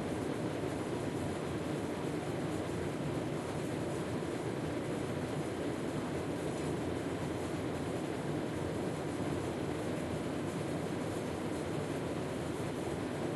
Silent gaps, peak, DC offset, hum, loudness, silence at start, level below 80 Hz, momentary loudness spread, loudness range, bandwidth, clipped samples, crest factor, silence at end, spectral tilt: none; -24 dBFS; under 0.1%; none; -38 LUFS; 0 s; -58 dBFS; 1 LU; 0 LU; 12 kHz; under 0.1%; 12 dB; 0 s; -6 dB/octave